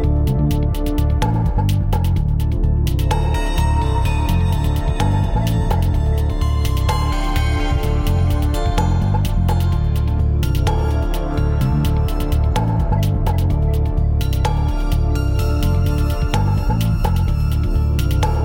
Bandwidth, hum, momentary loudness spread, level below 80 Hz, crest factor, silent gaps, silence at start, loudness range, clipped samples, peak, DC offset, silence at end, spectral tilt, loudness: 17 kHz; none; 2 LU; -18 dBFS; 12 dB; none; 0 s; 0 LU; under 0.1%; -4 dBFS; under 0.1%; 0 s; -7 dB/octave; -19 LUFS